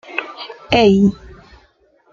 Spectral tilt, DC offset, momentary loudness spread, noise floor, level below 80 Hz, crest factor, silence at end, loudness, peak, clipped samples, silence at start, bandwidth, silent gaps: -6.5 dB/octave; under 0.1%; 21 LU; -55 dBFS; -42 dBFS; 18 dB; 1 s; -15 LUFS; 0 dBFS; under 0.1%; 0.1 s; 7.4 kHz; none